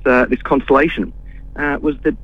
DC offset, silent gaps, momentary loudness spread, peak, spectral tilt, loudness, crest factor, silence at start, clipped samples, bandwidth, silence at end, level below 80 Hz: under 0.1%; none; 11 LU; 0 dBFS; -7.5 dB/octave; -16 LUFS; 16 dB; 0 s; under 0.1%; 7.2 kHz; 0 s; -32 dBFS